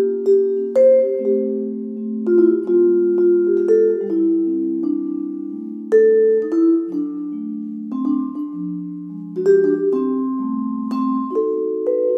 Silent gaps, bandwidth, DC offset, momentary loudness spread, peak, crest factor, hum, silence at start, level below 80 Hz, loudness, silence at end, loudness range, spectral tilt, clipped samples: none; 5.6 kHz; under 0.1%; 12 LU; -4 dBFS; 14 dB; none; 0 s; -78 dBFS; -18 LUFS; 0 s; 4 LU; -9.5 dB/octave; under 0.1%